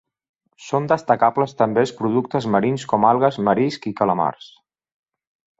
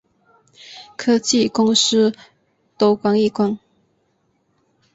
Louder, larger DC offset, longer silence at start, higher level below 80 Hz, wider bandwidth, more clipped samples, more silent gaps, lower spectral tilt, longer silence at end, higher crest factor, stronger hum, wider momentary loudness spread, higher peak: about the same, -19 LUFS vs -17 LUFS; neither; about the same, 0.6 s vs 0.7 s; about the same, -60 dBFS vs -62 dBFS; about the same, 8 kHz vs 8 kHz; neither; neither; first, -7 dB/octave vs -4 dB/octave; about the same, 1.3 s vs 1.4 s; about the same, 20 dB vs 16 dB; neither; second, 6 LU vs 21 LU; about the same, -2 dBFS vs -4 dBFS